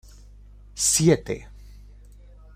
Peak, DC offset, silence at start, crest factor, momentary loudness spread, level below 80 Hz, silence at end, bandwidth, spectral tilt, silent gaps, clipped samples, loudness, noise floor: -6 dBFS; under 0.1%; 0.75 s; 22 dB; 17 LU; -46 dBFS; 1.1 s; 16 kHz; -4 dB/octave; none; under 0.1%; -21 LUFS; -47 dBFS